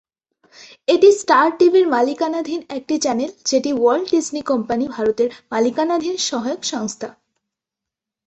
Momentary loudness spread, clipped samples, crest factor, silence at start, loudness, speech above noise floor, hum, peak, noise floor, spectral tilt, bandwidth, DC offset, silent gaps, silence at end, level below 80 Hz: 12 LU; under 0.1%; 18 dB; 0.6 s; -18 LUFS; 68 dB; none; -2 dBFS; -85 dBFS; -3 dB/octave; 8.4 kHz; under 0.1%; none; 1.15 s; -62 dBFS